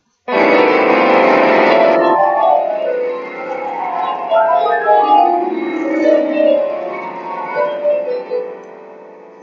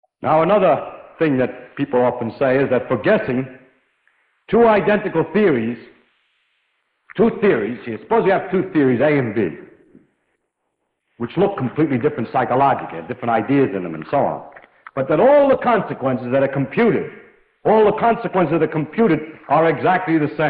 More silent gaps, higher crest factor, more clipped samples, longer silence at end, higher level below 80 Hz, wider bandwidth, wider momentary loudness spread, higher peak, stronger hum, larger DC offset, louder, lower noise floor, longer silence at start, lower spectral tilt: neither; about the same, 14 dB vs 14 dB; neither; first, 0.15 s vs 0 s; second, -72 dBFS vs -54 dBFS; first, 7 kHz vs 4.9 kHz; about the same, 13 LU vs 11 LU; first, 0 dBFS vs -4 dBFS; neither; neither; first, -14 LUFS vs -18 LUFS; second, -37 dBFS vs -74 dBFS; about the same, 0.25 s vs 0.2 s; second, -6 dB/octave vs -11 dB/octave